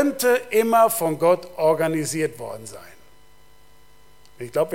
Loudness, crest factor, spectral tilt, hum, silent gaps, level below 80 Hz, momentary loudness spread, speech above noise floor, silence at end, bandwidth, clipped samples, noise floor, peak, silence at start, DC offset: -21 LUFS; 18 dB; -4.5 dB/octave; 50 Hz at -55 dBFS; none; -60 dBFS; 19 LU; 34 dB; 0 s; 17 kHz; under 0.1%; -55 dBFS; -6 dBFS; 0 s; 0.5%